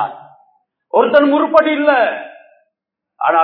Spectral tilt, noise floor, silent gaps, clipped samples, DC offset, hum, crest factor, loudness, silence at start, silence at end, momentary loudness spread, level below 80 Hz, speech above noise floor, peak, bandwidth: -6.5 dB/octave; -80 dBFS; none; 0.1%; under 0.1%; none; 16 dB; -13 LUFS; 0 s; 0 s; 13 LU; -62 dBFS; 67 dB; 0 dBFS; 5.4 kHz